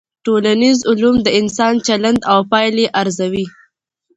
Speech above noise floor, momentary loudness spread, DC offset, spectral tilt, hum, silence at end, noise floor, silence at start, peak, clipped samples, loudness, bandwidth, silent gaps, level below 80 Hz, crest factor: 49 dB; 6 LU; under 0.1%; -4.5 dB/octave; none; 0.7 s; -63 dBFS; 0.25 s; 0 dBFS; under 0.1%; -14 LUFS; 8.2 kHz; none; -48 dBFS; 14 dB